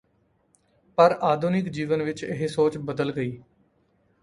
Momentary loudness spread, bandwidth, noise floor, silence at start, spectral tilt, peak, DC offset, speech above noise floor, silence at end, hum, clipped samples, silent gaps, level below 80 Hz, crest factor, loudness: 11 LU; 11.5 kHz; -67 dBFS; 1 s; -7 dB/octave; -4 dBFS; under 0.1%; 43 dB; 0.8 s; none; under 0.1%; none; -62 dBFS; 22 dB; -25 LUFS